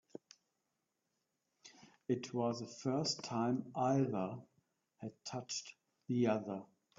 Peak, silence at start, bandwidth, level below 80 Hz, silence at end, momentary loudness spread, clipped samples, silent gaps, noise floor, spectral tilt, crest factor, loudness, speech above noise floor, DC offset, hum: -22 dBFS; 1.65 s; 7.4 kHz; -80 dBFS; 0.35 s; 21 LU; under 0.1%; none; -87 dBFS; -5.5 dB/octave; 18 dB; -39 LUFS; 49 dB; under 0.1%; none